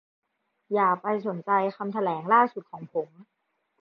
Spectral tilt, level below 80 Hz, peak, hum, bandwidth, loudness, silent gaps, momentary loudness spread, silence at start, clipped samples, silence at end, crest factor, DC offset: -9 dB/octave; -82 dBFS; -8 dBFS; none; 5.8 kHz; -26 LUFS; none; 12 LU; 0.7 s; under 0.1%; 0.6 s; 20 dB; under 0.1%